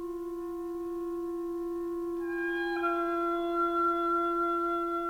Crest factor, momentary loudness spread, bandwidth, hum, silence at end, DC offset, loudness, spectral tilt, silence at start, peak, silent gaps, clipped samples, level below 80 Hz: 12 dB; 9 LU; 16 kHz; none; 0 s; under 0.1%; -31 LUFS; -5 dB/octave; 0 s; -20 dBFS; none; under 0.1%; -58 dBFS